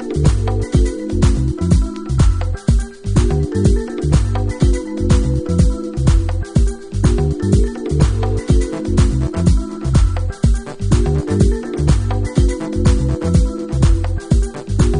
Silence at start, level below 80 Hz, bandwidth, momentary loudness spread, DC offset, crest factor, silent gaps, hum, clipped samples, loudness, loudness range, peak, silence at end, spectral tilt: 0 s; -18 dBFS; 10.5 kHz; 3 LU; under 0.1%; 14 dB; none; none; under 0.1%; -17 LUFS; 1 LU; 0 dBFS; 0 s; -7 dB/octave